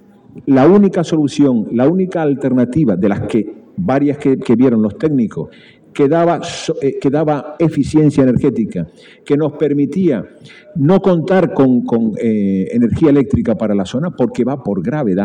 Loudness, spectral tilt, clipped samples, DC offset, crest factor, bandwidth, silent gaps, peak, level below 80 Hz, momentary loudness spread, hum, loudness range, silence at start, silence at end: -14 LUFS; -8 dB/octave; under 0.1%; under 0.1%; 12 dB; 10 kHz; none; 0 dBFS; -46 dBFS; 8 LU; none; 2 LU; 0.35 s; 0 s